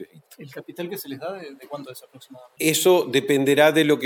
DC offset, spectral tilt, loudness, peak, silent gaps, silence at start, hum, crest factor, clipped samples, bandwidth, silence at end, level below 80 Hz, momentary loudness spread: under 0.1%; -4 dB/octave; -20 LUFS; -4 dBFS; none; 0 s; none; 18 dB; under 0.1%; over 20 kHz; 0 s; -76 dBFS; 22 LU